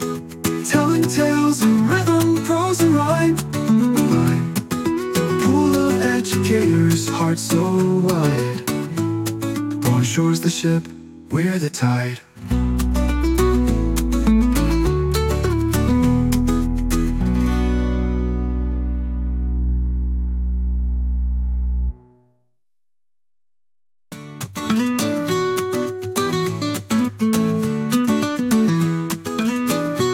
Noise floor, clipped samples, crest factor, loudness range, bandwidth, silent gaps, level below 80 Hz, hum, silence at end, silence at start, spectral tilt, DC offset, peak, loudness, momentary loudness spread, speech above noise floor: under -90 dBFS; under 0.1%; 14 dB; 8 LU; 17 kHz; none; -26 dBFS; none; 0 s; 0 s; -6 dB/octave; under 0.1%; -4 dBFS; -19 LUFS; 7 LU; over 72 dB